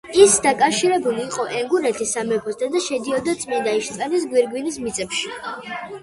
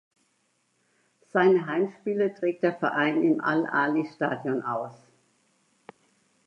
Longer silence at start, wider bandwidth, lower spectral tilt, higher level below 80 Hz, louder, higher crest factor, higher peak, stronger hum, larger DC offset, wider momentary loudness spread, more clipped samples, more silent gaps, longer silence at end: second, 0.05 s vs 1.35 s; first, 11.5 kHz vs 7.6 kHz; second, -2.5 dB/octave vs -7.5 dB/octave; first, -58 dBFS vs -82 dBFS; first, -20 LUFS vs -26 LUFS; about the same, 20 dB vs 18 dB; first, 0 dBFS vs -8 dBFS; neither; neither; first, 11 LU vs 8 LU; neither; neither; second, 0.05 s vs 1.5 s